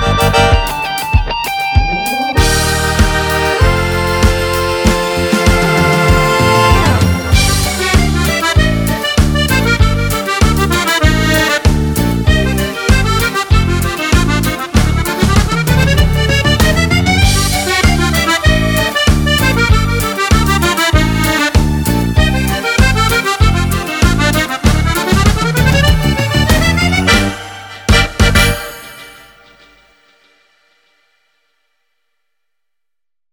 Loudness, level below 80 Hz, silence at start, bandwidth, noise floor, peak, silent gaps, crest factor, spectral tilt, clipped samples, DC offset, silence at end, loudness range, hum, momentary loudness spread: -12 LUFS; -18 dBFS; 0 s; over 20 kHz; -87 dBFS; 0 dBFS; none; 12 dB; -4.5 dB/octave; under 0.1%; under 0.1%; 4.2 s; 2 LU; none; 4 LU